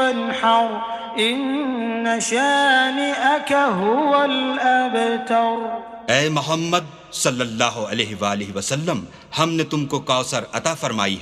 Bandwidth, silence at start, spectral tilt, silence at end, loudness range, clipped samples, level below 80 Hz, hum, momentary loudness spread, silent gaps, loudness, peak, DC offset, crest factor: 14 kHz; 0 s; -3.5 dB/octave; 0 s; 4 LU; under 0.1%; -60 dBFS; none; 7 LU; none; -20 LUFS; 0 dBFS; under 0.1%; 20 dB